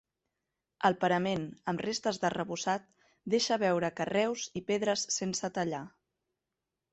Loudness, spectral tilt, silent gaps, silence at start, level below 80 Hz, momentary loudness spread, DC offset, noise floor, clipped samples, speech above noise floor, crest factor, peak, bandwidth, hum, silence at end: -32 LUFS; -4 dB/octave; none; 0.8 s; -70 dBFS; 8 LU; under 0.1%; -88 dBFS; under 0.1%; 56 dB; 20 dB; -12 dBFS; 8.4 kHz; none; 1.05 s